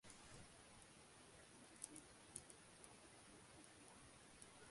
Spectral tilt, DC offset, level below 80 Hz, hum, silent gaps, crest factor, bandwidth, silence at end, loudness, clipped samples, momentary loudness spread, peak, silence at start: -2.5 dB/octave; under 0.1%; -78 dBFS; none; none; 34 dB; 11.5 kHz; 0 s; -62 LUFS; under 0.1%; 7 LU; -30 dBFS; 0.05 s